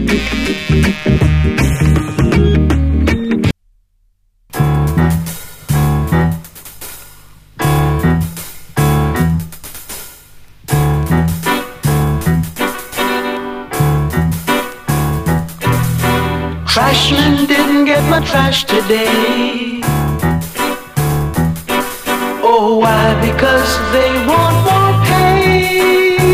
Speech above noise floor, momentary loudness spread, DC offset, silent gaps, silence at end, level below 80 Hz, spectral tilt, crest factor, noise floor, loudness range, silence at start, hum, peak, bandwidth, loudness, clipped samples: 44 dB; 10 LU; under 0.1%; none; 0 s; -24 dBFS; -5.5 dB/octave; 14 dB; -56 dBFS; 5 LU; 0 s; none; 0 dBFS; 15.5 kHz; -13 LUFS; under 0.1%